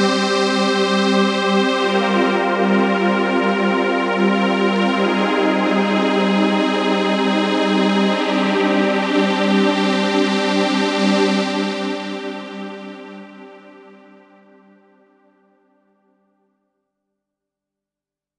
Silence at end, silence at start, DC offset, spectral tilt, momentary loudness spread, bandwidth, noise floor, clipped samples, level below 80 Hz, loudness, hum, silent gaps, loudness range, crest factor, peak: 4.7 s; 0 s; under 0.1%; -5.5 dB/octave; 8 LU; 11 kHz; -88 dBFS; under 0.1%; -74 dBFS; -17 LUFS; 50 Hz at -35 dBFS; none; 10 LU; 14 dB; -4 dBFS